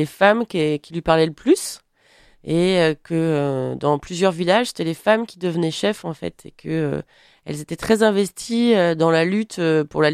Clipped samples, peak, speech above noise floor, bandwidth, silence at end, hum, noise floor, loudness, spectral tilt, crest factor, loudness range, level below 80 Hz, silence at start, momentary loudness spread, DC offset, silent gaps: under 0.1%; -2 dBFS; 35 dB; 15 kHz; 0 s; none; -54 dBFS; -20 LUFS; -5.5 dB/octave; 18 dB; 3 LU; -52 dBFS; 0 s; 13 LU; under 0.1%; none